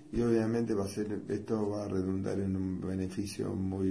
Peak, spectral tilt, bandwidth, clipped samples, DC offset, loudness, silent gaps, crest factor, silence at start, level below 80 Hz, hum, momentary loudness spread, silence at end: -16 dBFS; -7.5 dB/octave; 11 kHz; under 0.1%; under 0.1%; -34 LUFS; none; 16 dB; 0 s; -56 dBFS; none; 7 LU; 0 s